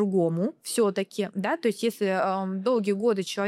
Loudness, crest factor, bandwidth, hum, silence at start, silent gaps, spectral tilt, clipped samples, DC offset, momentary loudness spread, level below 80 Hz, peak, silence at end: -26 LUFS; 14 dB; 15.5 kHz; none; 0 s; none; -5.5 dB/octave; under 0.1%; under 0.1%; 5 LU; -82 dBFS; -12 dBFS; 0 s